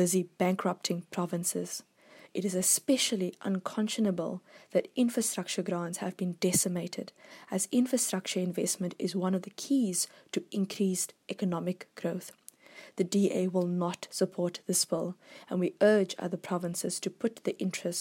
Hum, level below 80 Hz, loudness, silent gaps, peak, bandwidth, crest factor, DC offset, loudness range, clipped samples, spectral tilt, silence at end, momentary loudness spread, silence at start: none; -78 dBFS; -31 LUFS; none; -14 dBFS; 16.5 kHz; 18 dB; under 0.1%; 3 LU; under 0.1%; -4 dB/octave; 0 s; 10 LU; 0 s